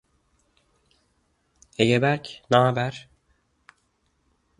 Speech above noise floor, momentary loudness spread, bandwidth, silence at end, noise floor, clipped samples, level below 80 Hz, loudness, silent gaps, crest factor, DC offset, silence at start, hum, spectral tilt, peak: 48 dB; 16 LU; 11.5 kHz; 1.6 s; -70 dBFS; under 0.1%; -62 dBFS; -22 LUFS; none; 24 dB; under 0.1%; 1.8 s; none; -6 dB/octave; -4 dBFS